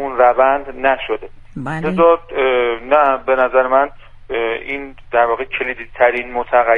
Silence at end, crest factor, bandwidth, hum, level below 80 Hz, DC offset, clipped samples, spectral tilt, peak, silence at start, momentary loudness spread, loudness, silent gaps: 0 s; 16 dB; 4.4 kHz; none; -40 dBFS; under 0.1%; under 0.1%; -7 dB/octave; 0 dBFS; 0 s; 12 LU; -16 LUFS; none